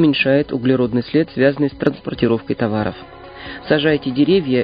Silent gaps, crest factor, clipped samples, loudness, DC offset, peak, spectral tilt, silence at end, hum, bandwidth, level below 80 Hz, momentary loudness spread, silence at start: none; 18 dB; under 0.1%; -17 LUFS; under 0.1%; 0 dBFS; -9.5 dB/octave; 0 s; none; 5.2 kHz; -46 dBFS; 15 LU; 0 s